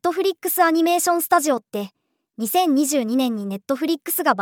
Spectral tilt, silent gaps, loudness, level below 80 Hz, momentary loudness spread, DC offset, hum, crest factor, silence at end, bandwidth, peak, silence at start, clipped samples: -3 dB/octave; none; -20 LUFS; -78 dBFS; 11 LU; under 0.1%; none; 18 dB; 0 s; over 20 kHz; -2 dBFS; 0.05 s; under 0.1%